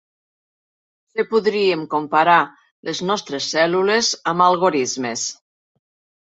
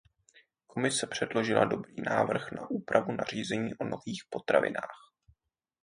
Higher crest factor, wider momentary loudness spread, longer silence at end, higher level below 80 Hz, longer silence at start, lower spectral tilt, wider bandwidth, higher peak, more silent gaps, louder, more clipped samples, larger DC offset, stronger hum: second, 18 dB vs 24 dB; about the same, 11 LU vs 10 LU; about the same, 0.95 s vs 0.85 s; about the same, -68 dBFS vs -68 dBFS; first, 1.15 s vs 0.75 s; second, -3 dB/octave vs -4.5 dB/octave; second, 8 kHz vs 10.5 kHz; first, -2 dBFS vs -8 dBFS; first, 2.71-2.83 s vs none; first, -19 LUFS vs -31 LUFS; neither; neither; neither